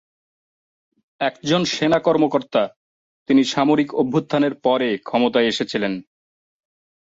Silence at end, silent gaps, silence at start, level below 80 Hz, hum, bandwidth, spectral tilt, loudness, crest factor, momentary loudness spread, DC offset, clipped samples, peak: 1.05 s; 2.76-3.26 s; 1.2 s; -62 dBFS; none; 7.8 kHz; -5 dB/octave; -19 LUFS; 16 dB; 7 LU; under 0.1%; under 0.1%; -4 dBFS